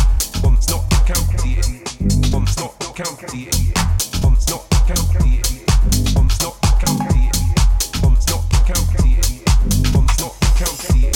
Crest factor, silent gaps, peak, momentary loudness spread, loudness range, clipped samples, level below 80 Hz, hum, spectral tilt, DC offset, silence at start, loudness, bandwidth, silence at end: 12 dB; none; -2 dBFS; 5 LU; 3 LU; under 0.1%; -16 dBFS; none; -4.5 dB/octave; under 0.1%; 0 s; -17 LUFS; 18 kHz; 0 s